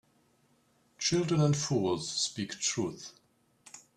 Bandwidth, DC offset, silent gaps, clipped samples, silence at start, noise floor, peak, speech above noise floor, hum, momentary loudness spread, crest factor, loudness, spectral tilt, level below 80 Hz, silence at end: 11.5 kHz; under 0.1%; none; under 0.1%; 1 s; -69 dBFS; -16 dBFS; 39 dB; none; 20 LU; 18 dB; -30 LUFS; -4.5 dB/octave; -66 dBFS; 0.2 s